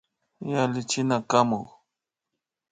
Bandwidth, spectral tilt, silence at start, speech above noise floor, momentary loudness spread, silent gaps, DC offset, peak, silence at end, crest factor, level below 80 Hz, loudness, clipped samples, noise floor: 9.6 kHz; -5 dB/octave; 0.4 s; 61 dB; 13 LU; none; under 0.1%; -6 dBFS; 1.05 s; 22 dB; -68 dBFS; -25 LUFS; under 0.1%; -85 dBFS